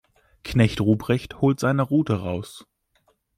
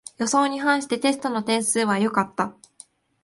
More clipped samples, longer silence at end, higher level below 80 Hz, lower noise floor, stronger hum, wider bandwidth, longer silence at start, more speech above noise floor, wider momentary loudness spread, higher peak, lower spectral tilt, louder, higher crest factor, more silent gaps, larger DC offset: neither; about the same, 0.8 s vs 0.75 s; first, -48 dBFS vs -68 dBFS; first, -66 dBFS vs -51 dBFS; neither; first, 15 kHz vs 12 kHz; first, 0.45 s vs 0.2 s; first, 45 dB vs 29 dB; first, 12 LU vs 5 LU; about the same, -6 dBFS vs -6 dBFS; first, -7 dB/octave vs -3.5 dB/octave; about the same, -23 LUFS vs -22 LUFS; about the same, 18 dB vs 18 dB; neither; neither